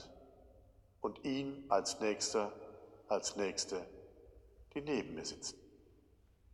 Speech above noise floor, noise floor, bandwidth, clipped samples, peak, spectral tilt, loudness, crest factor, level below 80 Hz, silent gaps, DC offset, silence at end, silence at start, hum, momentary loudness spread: 29 dB; -68 dBFS; 12.5 kHz; under 0.1%; -18 dBFS; -3 dB/octave; -39 LUFS; 24 dB; -68 dBFS; none; under 0.1%; 0.75 s; 0 s; none; 20 LU